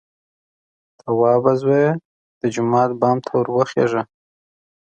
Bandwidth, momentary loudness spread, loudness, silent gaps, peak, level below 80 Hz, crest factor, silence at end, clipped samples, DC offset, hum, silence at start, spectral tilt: 8.8 kHz; 10 LU; -18 LUFS; 2.05-2.41 s; -2 dBFS; -64 dBFS; 18 dB; 0.9 s; under 0.1%; under 0.1%; none; 1.05 s; -7.5 dB/octave